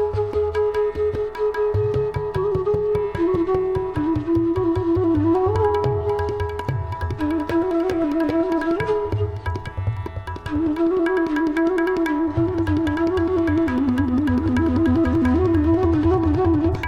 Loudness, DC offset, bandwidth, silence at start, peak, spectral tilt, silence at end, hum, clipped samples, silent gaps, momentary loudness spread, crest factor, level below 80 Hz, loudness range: -21 LUFS; under 0.1%; 9.4 kHz; 0 s; -8 dBFS; -9 dB/octave; 0 s; none; under 0.1%; none; 7 LU; 12 dB; -36 dBFS; 4 LU